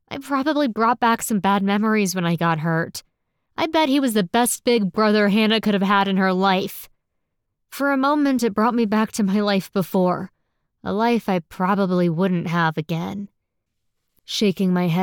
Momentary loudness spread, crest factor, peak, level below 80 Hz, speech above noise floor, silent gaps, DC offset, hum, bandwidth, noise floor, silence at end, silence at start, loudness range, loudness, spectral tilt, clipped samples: 10 LU; 14 dB; -6 dBFS; -62 dBFS; 56 dB; none; under 0.1%; none; 19.5 kHz; -75 dBFS; 0 s; 0.1 s; 3 LU; -20 LUFS; -5.5 dB/octave; under 0.1%